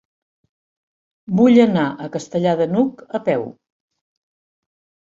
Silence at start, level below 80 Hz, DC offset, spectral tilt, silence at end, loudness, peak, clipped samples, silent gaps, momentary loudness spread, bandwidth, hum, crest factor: 1.3 s; -62 dBFS; under 0.1%; -7.5 dB/octave; 1.55 s; -18 LUFS; -2 dBFS; under 0.1%; none; 12 LU; 7.6 kHz; none; 18 dB